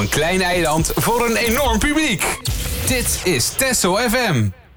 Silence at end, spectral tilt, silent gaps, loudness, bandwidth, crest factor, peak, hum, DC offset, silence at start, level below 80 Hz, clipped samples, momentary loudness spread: 0.1 s; -3.5 dB/octave; none; -17 LUFS; over 20 kHz; 12 dB; -6 dBFS; none; under 0.1%; 0 s; -30 dBFS; under 0.1%; 4 LU